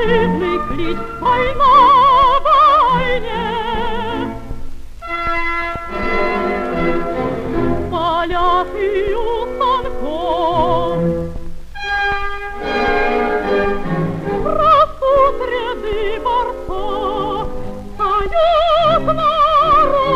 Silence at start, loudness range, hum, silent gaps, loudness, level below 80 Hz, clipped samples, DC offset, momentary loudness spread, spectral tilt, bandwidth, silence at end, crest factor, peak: 0 s; 8 LU; none; none; -16 LUFS; -28 dBFS; under 0.1%; under 0.1%; 12 LU; -6.5 dB/octave; 9 kHz; 0 s; 14 dB; 0 dBFS